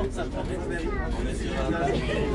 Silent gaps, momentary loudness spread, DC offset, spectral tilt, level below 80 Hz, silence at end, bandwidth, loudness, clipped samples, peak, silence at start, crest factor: none; 5 LU; under 0.1%; -6 dB/octave; -32 dBFS; 0 s; 11.5 kHz; -29 LUFS; under 0.1%; -12 dBFS; 0 s; 14 dB